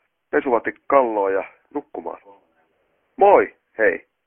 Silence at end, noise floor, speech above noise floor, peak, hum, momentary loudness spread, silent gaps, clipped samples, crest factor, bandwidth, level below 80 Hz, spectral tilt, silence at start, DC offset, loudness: 0.3 s; -67 dBFS; 48 dB; 0 dBFS; none; 18 LU; none; under 0.1%; 20 dB; 3.5 kHz; -60 dBFS; -9.5 dB/octave; 0.35 s; under 0.1%; -19 LUFS